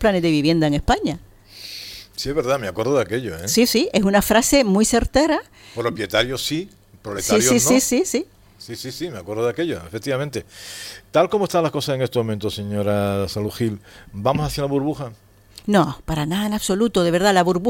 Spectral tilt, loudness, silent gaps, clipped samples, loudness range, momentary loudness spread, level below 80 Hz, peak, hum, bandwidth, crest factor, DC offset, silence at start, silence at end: -4.5 dB/octave; -20 LUFS; none; under 0.1%; 5 LU; 17 LU; -40 dBFS; -2 dBFS; none; 17 kHz; 18 dB; under 0.1%; 0 s; 0 s